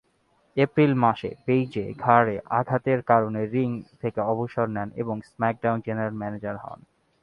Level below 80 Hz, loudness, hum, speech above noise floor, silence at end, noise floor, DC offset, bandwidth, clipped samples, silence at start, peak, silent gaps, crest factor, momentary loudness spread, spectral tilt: -60 dBFS; -25 LUFS; none; 42 dB; 0.45 s; -66 dBFS; under 0.1%; 6 kHz; under 0.1%; 0.55 s; -2 dBFS; none; 22 dB; 11 LU; -9.5 dB/octave